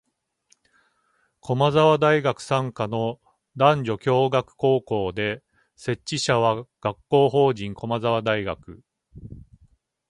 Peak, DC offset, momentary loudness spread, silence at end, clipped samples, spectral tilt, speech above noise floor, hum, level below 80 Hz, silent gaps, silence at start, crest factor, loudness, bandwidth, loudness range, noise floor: -2 dBFS; under 0.1%; 15 LU; 0.7 s; under 0.1%; -6 dB/octave; 46 dB; none; -56 dBFS; none; 1.45 s; 20 dB; -22 LUFS; 11.5 kHz; 3 LU; -68 dBFS